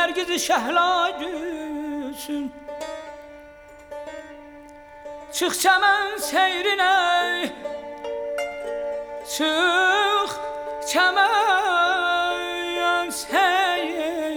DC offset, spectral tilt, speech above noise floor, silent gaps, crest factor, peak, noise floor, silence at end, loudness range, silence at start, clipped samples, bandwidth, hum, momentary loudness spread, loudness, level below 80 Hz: under 0.1%; -0.5 dB/octave; 24 dB; none; 18 dB; -6 dBFS; -45 dBFS; 0 s; 13 LU; 0 s; under 0.1%; over 20 kHz; none; 17 LU; -21 LUFS; -58 dBFS